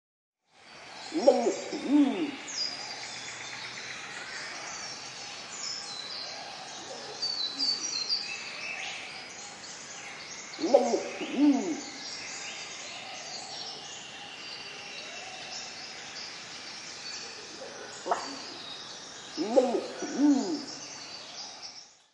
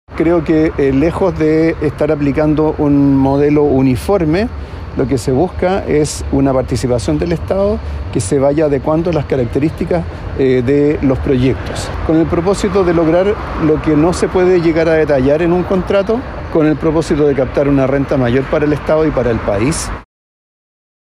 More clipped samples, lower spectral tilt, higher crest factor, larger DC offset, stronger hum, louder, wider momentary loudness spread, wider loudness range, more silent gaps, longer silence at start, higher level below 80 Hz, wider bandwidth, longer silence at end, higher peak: neither; second, -2 dB/octave vs -7 dB/octave; first, 26 dB vs 10 dB; neither; neither; second, -32 LUFS vs -13 LUFS; first, 15 LU vs 5 LU; first, 9 LU vs 3 LU; neither; first, 0.55 s vs 0.1 s; second, -78 dBFS vs -28 dBFS; second, 11 kHz vs 13 kHz; second, 0.2 s vs 1 s; second, -6 dBFS vs -2 dBFS